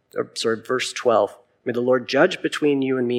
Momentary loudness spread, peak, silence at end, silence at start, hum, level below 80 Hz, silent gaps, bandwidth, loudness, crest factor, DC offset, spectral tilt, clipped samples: 8 LU; -2 dBFS; 0 s; 0.15 s; none; -76 dBFS; none; 15 kHz; -21 LUFS; 18 dB; under 0.1%; -4.5 dB/octave; under 0.1%